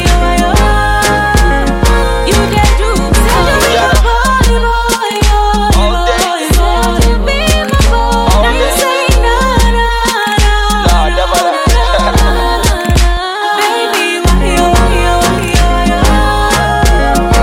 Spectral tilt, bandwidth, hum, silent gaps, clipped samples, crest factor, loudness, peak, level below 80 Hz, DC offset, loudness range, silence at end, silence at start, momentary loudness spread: -4.5 dB/octave; 16.5 kHz; none; none; under 0.1%; 8 dB; -10 LUFS; 0 dBFS; -12 dBFS; under 0.1%; 1 LU; 0 s; 0 s; 2 LU